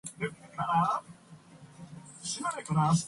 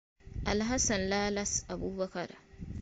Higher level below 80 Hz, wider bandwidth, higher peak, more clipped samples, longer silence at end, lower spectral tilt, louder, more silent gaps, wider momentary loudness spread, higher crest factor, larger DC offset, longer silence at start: second, -66 dBFS vs -46 dBFS; first, 11.5 kHz vs 9.4 kHz; about the same, -16 dBFS vs -18 dBFS; neither; about the same, 0 s vs 0 s; first, -5 dB/octave vs -3.5 dB/octave; about the same, -32 LUFS vs -32 LUFS; neither; first, 22 LU vs 16 LU; about the same, 16 dB vs 16 dB; neither; second, 0.05 s vs 0.25 s